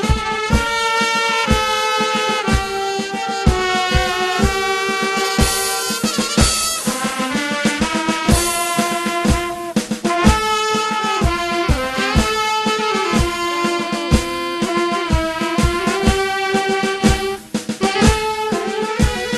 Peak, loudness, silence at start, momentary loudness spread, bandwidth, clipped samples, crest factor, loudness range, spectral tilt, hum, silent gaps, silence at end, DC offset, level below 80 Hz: 0 dBFS; -17 LUFS; 0 s; 5 LU; 13 kHz; under 0.1%; 18 dB; 1 LU; -4 dB/octave; none; none; 0 s; under 0.1%; -26 dBFS